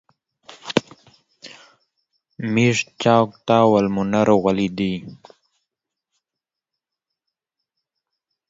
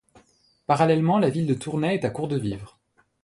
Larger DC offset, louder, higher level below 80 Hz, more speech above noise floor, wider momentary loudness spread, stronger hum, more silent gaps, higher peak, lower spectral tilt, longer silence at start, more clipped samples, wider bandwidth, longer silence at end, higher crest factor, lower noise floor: neither; first, -19 LUFS vs -23 LUFS; about the same, -58 dBFS vs -58 dBFS; first, 69 dB vs 39 dB; first, 15 LU vs 12 LU; neither; neither; first, 0 dBFS vs -6 dBFS; about the same, -6 dB/octave vs -7 dB/octave; about the same, 0.65 s vs 0.7 s; neither; second, 7.8 kHz vs 11.5 kHz; first, 3.35 s vs 0.55 s; about the same, 22 dB vs 18 dB; first, -87 dBFS vs -62 dBFS